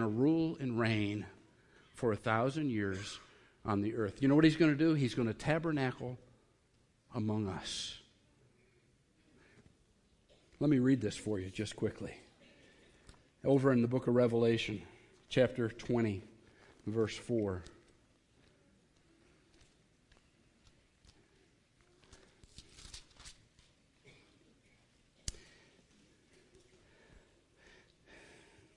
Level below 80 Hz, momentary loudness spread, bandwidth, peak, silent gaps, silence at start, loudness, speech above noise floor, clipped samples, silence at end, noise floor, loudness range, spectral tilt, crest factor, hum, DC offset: -64 dBFS; 19 LU; 11 kHz; -14 dBFS; none; 0 s; -34 LUFS; 39 dB; under 0.1%; 3.35 s; -72 dBFS; 22 LU; -6.5 dB/octave; 22 dB; none; under 0.1%